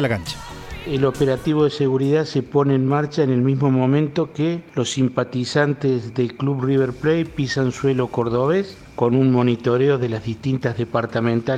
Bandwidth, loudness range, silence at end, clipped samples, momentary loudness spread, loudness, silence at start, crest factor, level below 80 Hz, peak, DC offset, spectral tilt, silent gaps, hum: 12 kHz; 2 LU; 0 s; under 0.1%; 6 LU; -20 LUFS; 0 s; 16 dB; -48 dBFS; -2 dBFS; under 0.1%; -7 dB/octave; none; none